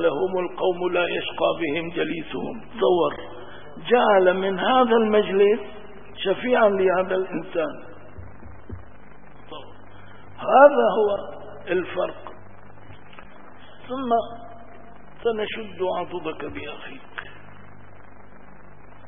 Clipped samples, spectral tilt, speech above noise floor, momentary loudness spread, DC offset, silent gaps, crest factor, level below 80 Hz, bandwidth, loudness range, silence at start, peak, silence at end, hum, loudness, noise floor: under 0.1%; -10 dB/octave; 26 dB; 24 LU; 1%; none; 24 dB; -56 dBFS; 3.7 kHz; 11 LU; 0 s; 0 dBFS; 1.55 s; none; -22 LUFS; -48 dBFS